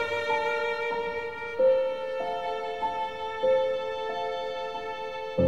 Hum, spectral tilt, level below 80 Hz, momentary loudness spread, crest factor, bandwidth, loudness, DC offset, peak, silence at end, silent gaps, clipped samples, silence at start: none; -5.5 dB/octave; -62 dBFS; 9 LU; 16 dB; 8 kHz; -29 LUFS; 0.4%; -14 dBFS; 0 s; none; under 0.1%; 0 s